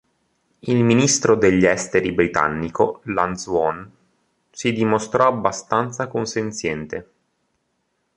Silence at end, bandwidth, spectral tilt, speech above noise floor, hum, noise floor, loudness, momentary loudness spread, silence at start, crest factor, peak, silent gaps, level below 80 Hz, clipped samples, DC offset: 1.15 s; 11.5 kHz; -4.5 dB/octave; 51 dB; none; -71 dBFS; -20 LUFS; 10 LU; 0.65 s; 20 dB; -2 dBFS; none; -50 dBFS; under 0.1%; under 0.1%